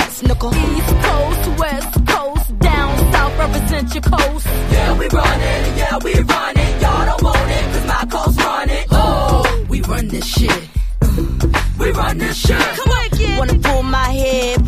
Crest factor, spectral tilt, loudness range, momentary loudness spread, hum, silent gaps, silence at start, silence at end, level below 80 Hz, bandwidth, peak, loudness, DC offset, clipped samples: 14 dB; -5 dB/octave; 1 LU; 4 LU; none; none; 0 s; 0 s; -18 dBFS; 15.5 kHz; 0 dBFS; -16 LUFS; under 0.1%; under 0.1%